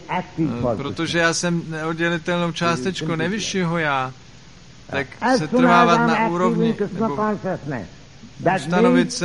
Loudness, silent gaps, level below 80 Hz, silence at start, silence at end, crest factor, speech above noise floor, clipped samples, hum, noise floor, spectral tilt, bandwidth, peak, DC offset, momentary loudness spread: -20 LUFS; none; -50 dBFS; 0 s; 0 s; 20 dB; 25 dB; under 0.1%; none; -45 dBFS; -5 dB/octave; 11.5 kHz; -2 dBFS; 0.4%; 11 LU